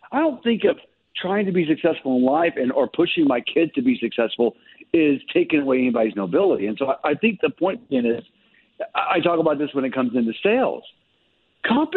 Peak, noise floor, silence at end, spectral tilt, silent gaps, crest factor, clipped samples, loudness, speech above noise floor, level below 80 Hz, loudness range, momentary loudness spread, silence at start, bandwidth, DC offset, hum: -6 dBFS; -65 dBFS; 0 s; -9 dB/octave; none; 16 dB; under 0.1%; -21 LUFS; 44 dB; -64 dBFS; 2 LU; 6 LU; 0.1 s; 4.3 kHz; under 0.1%; none